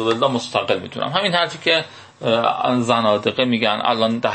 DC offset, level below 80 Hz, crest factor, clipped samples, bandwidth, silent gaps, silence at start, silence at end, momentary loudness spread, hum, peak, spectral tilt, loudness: under 0.1%; -64 dBFS; 16 dB; under 0.1%; 8.8 kHz; none; 0 s; 0 s; 5 LU; none; -2 dBFS; -4.5 dB/octave; -19 LUFS